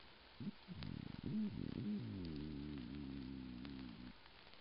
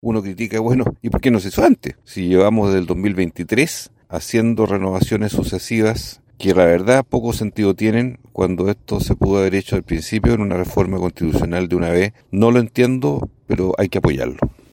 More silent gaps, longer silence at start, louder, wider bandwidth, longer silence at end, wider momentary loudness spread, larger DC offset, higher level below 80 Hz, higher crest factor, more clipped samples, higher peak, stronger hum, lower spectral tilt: neither; about the same, 0 s vs 0.05 s; second, -49 LUFS vs -18 LUFS; second, 5.6 kHz vs 17 kHz; second, 0 s vs 0.2 s; first, 12 LU vs 8 LU; neither; second, -62 dBFS vs -34 dBFS; about the same, 20 dB vs 18 dB; neither; second, -28 dBFS vs 0 dBFS; neither; about the same, -6.5 dB/octave vs -6.5 dB/octave